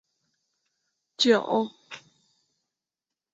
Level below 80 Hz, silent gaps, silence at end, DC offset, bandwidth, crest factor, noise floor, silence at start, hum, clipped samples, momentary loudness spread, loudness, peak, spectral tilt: -78 dBFS; none; 1.35 s; under 0.1%; 8 kHz; 22 dB; -90 dBFS; 1.2 s; none; under 0.1%; 23 LU; -24 LUFS; -8 dBFS; -3.5 dB/octave